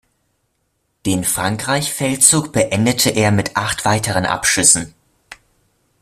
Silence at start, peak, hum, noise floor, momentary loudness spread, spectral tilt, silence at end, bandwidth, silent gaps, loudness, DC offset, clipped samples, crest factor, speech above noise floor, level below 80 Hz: 1.05 s; 0 dBFS; none; -68 dBFS; 8 LU; -3 dB/octave; 0.65 s; 16 kHz; none; -15 LUFS; under 0.1%; under 0.1%; 18 dB; 52 dB; -48 dBFS